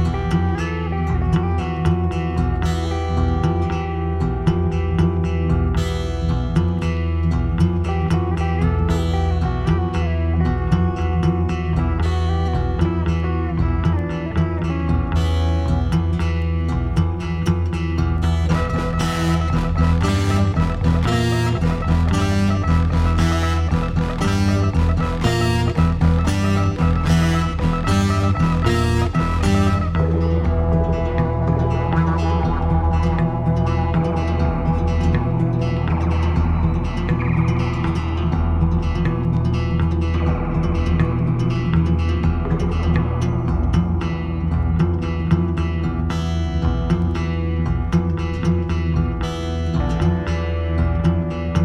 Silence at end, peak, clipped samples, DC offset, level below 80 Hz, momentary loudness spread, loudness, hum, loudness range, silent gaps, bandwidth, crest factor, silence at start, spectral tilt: 0 s; -4 dBFS; under 0.1%; under 0.1%; -24 dBFS; 4 LU; -20 LUFS; none; 2 LU; none; 10.5 kHz; 14 dB; 0 s; -7.5 dB/octave